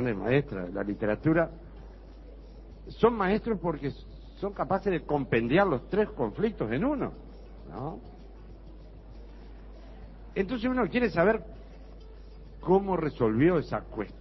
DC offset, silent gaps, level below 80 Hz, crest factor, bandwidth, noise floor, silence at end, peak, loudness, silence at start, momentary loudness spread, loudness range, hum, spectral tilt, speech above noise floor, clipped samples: under 0.1%; none; -46 dBFS; 20 dB; 6 kHz; -47 dBFS; 0 s; -10 dBFS; -28 LUFS; 0 s; 25 LU; 8 LU; none; -9.5 dB/octave; 19 dB; under 0.1%